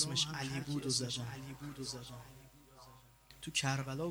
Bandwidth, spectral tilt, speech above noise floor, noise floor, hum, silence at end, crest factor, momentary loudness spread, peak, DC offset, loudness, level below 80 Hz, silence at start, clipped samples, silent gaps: over 20 kHz; -3.5 dB/octave; 21 dB; -61 dBFS; none; 0 s; 20 dB; 23 LU; -20 dBFS; under 0.1%; -38 LUFS; -64 dBFS; 0 s; under 0.1%; none